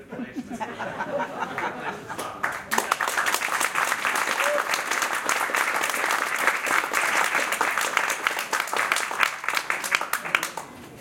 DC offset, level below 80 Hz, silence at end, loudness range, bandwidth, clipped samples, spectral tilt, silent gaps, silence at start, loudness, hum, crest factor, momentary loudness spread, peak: under 0.1%; -66 dBFS; 0 s; 4 LU; 17 kHz; under 0.1%; -0.5 dB/octave; none; 0 s; -24 LUFS; none; 26 dB; 10 LU; 0 dBFS